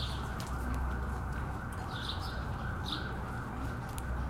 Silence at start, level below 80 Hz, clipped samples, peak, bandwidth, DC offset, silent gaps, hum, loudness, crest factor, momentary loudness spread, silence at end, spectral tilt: 0 s; -40 dBFS; under 0.1%; -20 dBFS; 16 kHz; under 0.1%; none; none; -38 LUFS; 16 dB; 3 LU; 0 s; -5.5 dB/octave